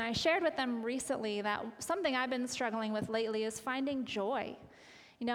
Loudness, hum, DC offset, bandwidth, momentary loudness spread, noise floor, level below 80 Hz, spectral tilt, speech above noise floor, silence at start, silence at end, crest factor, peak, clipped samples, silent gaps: -35 LUFS; none; under 0.1%; 18 kHz; 7 LU; -58 dBFS; -68 dBFS; -3.5 dB/octave; 23 dB; 0 s; 0 s; 18 dB; -18 dBFS; under 0.1%; none